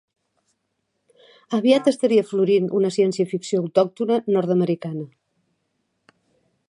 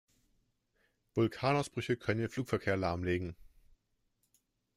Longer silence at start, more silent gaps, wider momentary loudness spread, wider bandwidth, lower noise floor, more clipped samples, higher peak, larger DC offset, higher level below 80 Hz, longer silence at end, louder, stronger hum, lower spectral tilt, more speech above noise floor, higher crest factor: first, 1.5 s vs 1.15 s; neither; first, 9 LU vs 5 LU; second, 11 kHz vs 15 kHz; second, -74 dBFS vs -79 dBFS; neither; first, -4 dBFS vs -16 dBFS; neither; second, -76 dBFS vs -64 dBFS; first, 1.6 s vs 1.35 s; first, -20 LUFS vs -34 LUFS; neither; about the same, -6.5 dB/octave vs -6.5 dB/octave; first, 55 dB vs 45 dB; about the same, 18 dB vs 20 dB